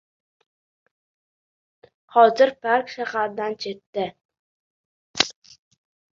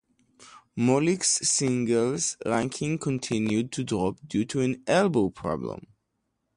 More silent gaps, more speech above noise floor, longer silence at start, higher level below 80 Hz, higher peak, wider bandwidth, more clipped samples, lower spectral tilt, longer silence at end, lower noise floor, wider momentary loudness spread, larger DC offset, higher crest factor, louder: first, 3.86-3.93 s, 4.25-4.29 s, 4.39-5.14 s vs none; first, over 69 dB vs 52 dB; first, 2.15 s vs 0.4 s; second, -70 dBFS vs -58 dBFS; first, 0 dBFS vs -10 dBFS; second, 7.6 kHz vs 11.5 kHz; neither; second, -2.5 dB/octave vs -4.5 dB/octave; about the same, 0.85 s vs 0.8 s; first, under -90 dBFS vs -78 dBFS; first, 14 LU vs 8 LU; neither; first, 24 dB vs 16 dB; first, -22 LUFS vs -26 LUFS